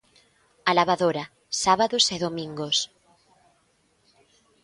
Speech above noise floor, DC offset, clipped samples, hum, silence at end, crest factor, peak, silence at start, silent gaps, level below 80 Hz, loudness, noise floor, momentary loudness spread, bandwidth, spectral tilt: 43 dB; under 0.1%; under 0.1%; none; 1.8 s; 22 dB; -4 dBFS; 0.65 s; none; -64 dBFS; -24 LUFS; -66 dBFS; 11 LU; 11.5 kHz; -2.5 dB/octave